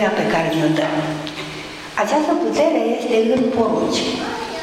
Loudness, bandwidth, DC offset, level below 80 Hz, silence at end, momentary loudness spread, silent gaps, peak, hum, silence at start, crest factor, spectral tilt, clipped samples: -19 LUFS; 15 kHz; under 0.1%; -52 dBFS; 0 s; 9 LU; none; -4 dBFS; none; 0 s; 14 dB; -5 dB/octave; under 0.1%